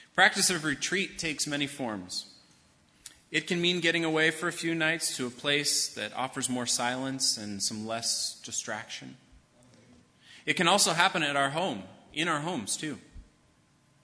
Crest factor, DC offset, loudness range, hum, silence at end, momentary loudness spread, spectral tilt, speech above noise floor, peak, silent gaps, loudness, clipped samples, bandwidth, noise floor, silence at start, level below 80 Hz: 26 dB; under 0.1%; 4 LU; none; 0.8 s; 13 LU; -2 dB/octave; 36 dB; -6 dBFS; none; -28 LUFS; under 0.1%; 11 kHz; -65 dBFS; 0 s; -66 dBFS